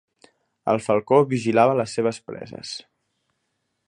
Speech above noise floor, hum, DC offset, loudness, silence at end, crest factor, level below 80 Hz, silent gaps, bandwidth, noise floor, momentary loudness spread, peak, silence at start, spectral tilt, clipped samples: 54 dB; none; under 0.1%; -21 LUFS; 1.1 s; 20 dB; -66 dBFS; none; 11 kHz; -75 dBFS; 17 LU; -4 dBFS; 0.65 s; -6 dB/octave; under 0.1%